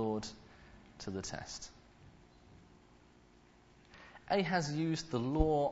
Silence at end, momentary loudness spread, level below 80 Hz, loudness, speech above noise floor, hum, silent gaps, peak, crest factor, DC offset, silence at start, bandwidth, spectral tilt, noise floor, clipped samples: 0 s; 25 LU; -50 dBFS; -37 LUFS; 29 dB; none; none; -14 dBFS; 24 dB; under 0.1%; 0 s; 7.6 kHz; -5 dB/octave; -63 dBFS; under 0.1%